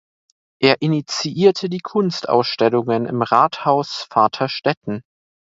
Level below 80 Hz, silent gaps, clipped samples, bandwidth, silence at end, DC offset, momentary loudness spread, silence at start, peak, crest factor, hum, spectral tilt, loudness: -62 dBFS; 4.77-4.81 s; under 0.1%; 7.8 kHz; 0.6 s; under 0.1%; 7 LU; 0.6 s; 0 dBFS; 18 dB; none; -5.5 dB/octave; -18 LUFS